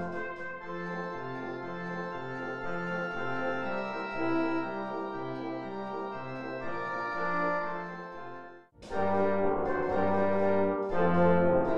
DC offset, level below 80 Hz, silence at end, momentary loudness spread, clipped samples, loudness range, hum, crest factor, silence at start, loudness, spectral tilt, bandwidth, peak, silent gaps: 0.6%; -56 dBFS; 0 s; 11 LU; under 0.1%; 6 LU; none; 18 dB; 0 s; -32 LUFS; -8 dB/octave; 7.8 kHz; -12 dBFS; none